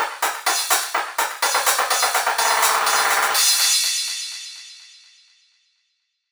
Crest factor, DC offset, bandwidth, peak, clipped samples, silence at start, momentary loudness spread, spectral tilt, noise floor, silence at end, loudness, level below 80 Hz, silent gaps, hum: 18 dB; under 0.1%; over 20 kHz; -4 dBFS; under 0.1%; 0 s; 13 LU; 3.5 dB/octave; -72 dBFS; 1.45 s; -18 LUFS; -68 dBFS; none; none